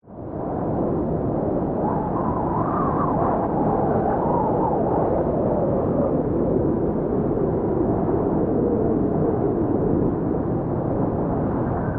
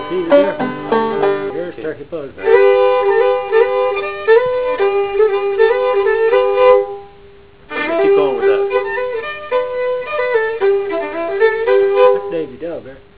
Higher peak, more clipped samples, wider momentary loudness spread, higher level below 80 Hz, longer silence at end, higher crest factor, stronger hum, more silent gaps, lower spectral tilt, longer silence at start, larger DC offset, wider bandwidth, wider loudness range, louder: second, -8 dBFS vs 0 dBFS; neither; second, 3 LU vs 12 LU; first, -38 dBFS vs -50 dBFS; second, 0 s vs 0.2 s; about the same, 12 dB vs 14 dB; neither; neither; first, -11.5 dB/octave vs -8.5 dB/octave; about the same, 0.05 s vs 0 s; second, under 0.1% vs 1%; second, 3.5 kHz vs 4 kHz; about the same, 1 LU vs 3 LU; second, -22 LUFS vs -15 LUFS